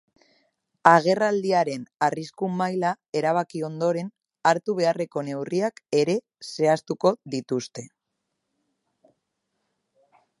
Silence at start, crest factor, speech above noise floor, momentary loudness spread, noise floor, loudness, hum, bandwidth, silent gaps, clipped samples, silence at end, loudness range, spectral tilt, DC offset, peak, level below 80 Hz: 0.85 s; 26 dB; 57 dB; 10 LU; -80 dBFS; -24 LUFS; none; 11.5 kHz; 3.09-3.13 s; under 0.1%; 2.55 s; 7 LU; -5.5 dB/octave; under 0.1%; 0 dBFS; -76 dBFS